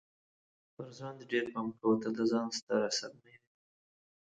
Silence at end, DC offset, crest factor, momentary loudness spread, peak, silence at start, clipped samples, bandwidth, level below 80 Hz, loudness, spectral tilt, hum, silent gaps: 1.2 s; under 0.1%; 18 dB; 16 LU; -18 dBFS; 0.8 s; under 0.1%; 9.2 kHz; -80 dBFS; -34 LUFS; -4 dB/octave; none; 2.62-2.67 s